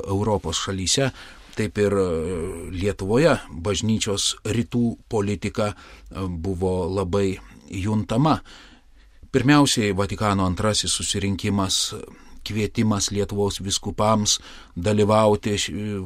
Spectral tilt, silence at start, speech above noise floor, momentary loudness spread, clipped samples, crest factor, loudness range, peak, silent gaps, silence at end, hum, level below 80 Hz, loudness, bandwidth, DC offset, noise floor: -4.5 dB/octave; 0 s; 28 dB; 11 LU; under 0.1%; 18 dB; 4 LU; -4 dBFS; none; 0 s; none; -42 dBFS; -22 LUFS; 16 kHz; under 0.1%; -50 dBFS